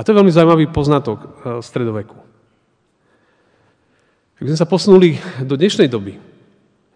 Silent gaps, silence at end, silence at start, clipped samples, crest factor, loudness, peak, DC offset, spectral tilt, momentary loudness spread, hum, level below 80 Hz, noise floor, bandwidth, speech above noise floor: none; 0.8 s; 0 s; 0.2%; 16 dB; -14 LUFS; 0 dBFS; under 0.1%; -7 dB/octave; 17 LU; none; -46 dBFS; -61 dBFS; 10 kHz; 48 dB